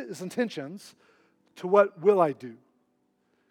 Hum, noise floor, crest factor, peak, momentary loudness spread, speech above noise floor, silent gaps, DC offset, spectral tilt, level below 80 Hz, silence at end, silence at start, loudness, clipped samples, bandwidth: none; -72 dBFS; 22 dB; -6 dBFS; 19 LU; 46 dB; none; under 0.1%; -6 dB/octave; under -90 dBFS; 0.95 s; 0 s; -25 LUFS; under 0.1%; 13.5 kHz